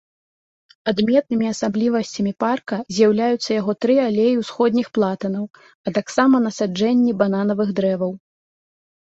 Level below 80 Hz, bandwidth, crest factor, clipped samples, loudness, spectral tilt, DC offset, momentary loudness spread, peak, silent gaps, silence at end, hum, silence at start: -62 dBFS; 8 kHz; 16 dB; under 0.1%; -20 LUFS; -6 dB/octave; under 0.1%; 9 LU; -4 dBFS; 5.75-5.84 s; 0.85 s; none; 0.85 s